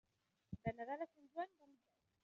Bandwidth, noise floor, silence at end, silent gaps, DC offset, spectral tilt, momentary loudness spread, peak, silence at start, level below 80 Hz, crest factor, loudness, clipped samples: 7.2 kHz; -81 dBFS; 0.5 s; none; under 0.1%; -6.5 dB/octave; 5 LU; -28 dBFS; 0.5 s; -74 dBFS; 22 dB; -49 LUFS; under 0.1%